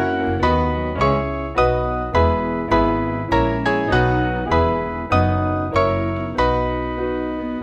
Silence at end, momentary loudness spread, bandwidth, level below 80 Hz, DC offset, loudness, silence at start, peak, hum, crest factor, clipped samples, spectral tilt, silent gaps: 0 s; 5 LU; 8.4 kHz; -30 dBFS; under 0.1%; -20 LUFS; 0 s; -4 dBFS; none; 16 dB; under 0.1%; -7.5 dB/octave; none